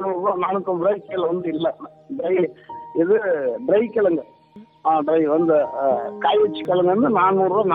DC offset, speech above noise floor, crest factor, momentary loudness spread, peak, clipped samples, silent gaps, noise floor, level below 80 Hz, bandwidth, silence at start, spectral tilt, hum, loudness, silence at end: under 0.1%; 21 dB; 14 dB; 9 LU; -6 dBFS; under 0.1%; none; -41 dBFS; -64 dBFS; 4.4 kHz; 0 s; -9 dB/octave; none; -20 LUFS; 0 s